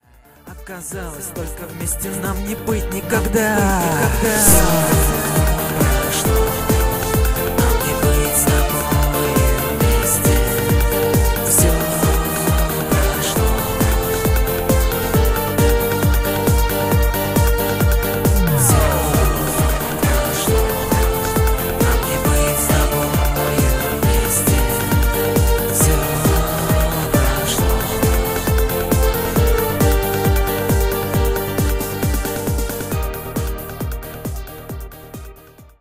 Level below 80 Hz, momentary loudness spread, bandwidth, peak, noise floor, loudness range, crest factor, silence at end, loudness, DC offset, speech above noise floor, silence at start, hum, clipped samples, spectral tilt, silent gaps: -22 dBFS; 9 LU; 16.5 kHz; 0 dBFS; -43 dBFS; 5 LU; 16 dB; 0.15 s; -17 LUFS; under 0.1%; 26 dB; 0.45 s; none; under 0.1%; -4.5 dB/octave; none